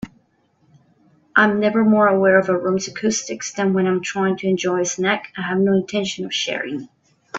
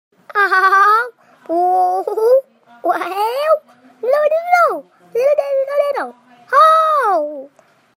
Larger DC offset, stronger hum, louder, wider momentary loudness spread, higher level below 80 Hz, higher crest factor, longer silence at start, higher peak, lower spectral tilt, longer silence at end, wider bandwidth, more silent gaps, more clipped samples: neither; neither; second, -19 LUFS vs -15 LUFS; second, 9 LU vs 14 LU; first, -60 dBFS vs -84 dBFS; about the same, 20 dB vs 16 dB; second, 0 s vs 0.3 s; about the same, 0 dBFS vs 0 dBFS; first, -4.5 dB/octave vs -2 dB/octave; second, 0 s vs 0.5 s; second, 8 kHz vs 16.5 kHz; neither; neither